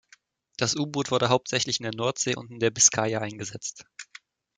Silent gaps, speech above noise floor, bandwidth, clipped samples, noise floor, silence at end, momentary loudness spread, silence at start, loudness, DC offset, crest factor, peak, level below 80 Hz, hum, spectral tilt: none; 34 dB; 10.5 kHz; under 0.1%; -60 dBFS; 0.55 s; 24 LU; 0.6 s; -25 LUFS; under 0.1%; 22 dB; -6 dBFS; -66 dBFS; none; -2.5 dB/octave